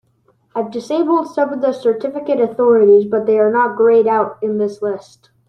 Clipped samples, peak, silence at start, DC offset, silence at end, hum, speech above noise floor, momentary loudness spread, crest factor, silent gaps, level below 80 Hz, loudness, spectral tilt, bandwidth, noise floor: under 0.1%; -2 dBFS; 0.55 s; under 0.1%; 0.45 s; none; 44 dB; 12 LU; 14 dB; none; -66 dBFS; -15 LUFS; -7 dB/octave; 9 kHz; -59 dBFS